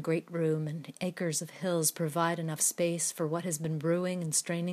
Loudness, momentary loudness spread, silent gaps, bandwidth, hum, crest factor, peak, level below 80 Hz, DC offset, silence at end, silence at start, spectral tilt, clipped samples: -31 LUFS; 5 LU; none; 15.5 kHz; none; 18 dB; -14 dBFS; -80 dBFS; under 0.1%; 0 s; 0 s; -4.5 dB/octave; under 0.1%